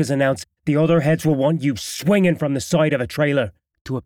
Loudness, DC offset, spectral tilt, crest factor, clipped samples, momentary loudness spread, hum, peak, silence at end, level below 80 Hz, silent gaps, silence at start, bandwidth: -19 LUFS; under 0.1%; -6 dB/octave; 14 dB; under 0.1%; 6 LU; none; -4 dBFS; 0.05 s; -52 dBFS; 3.81-3.85 s; 0 s; 16.5 kHz